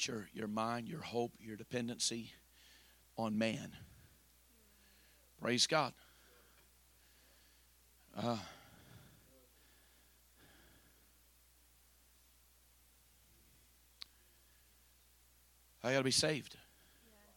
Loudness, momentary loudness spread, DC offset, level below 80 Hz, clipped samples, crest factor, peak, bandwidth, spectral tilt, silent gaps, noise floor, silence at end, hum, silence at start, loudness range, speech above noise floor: -38 LUFS; 28 LU; under 0.1%; -72 dBFS; under 0.1%; 26 dB; -18 dBFS; 17.5 kHz; -3 dB/octave; none; -69 dBFS; 0.75 s; none; 0 s; 22 LU; 30 dB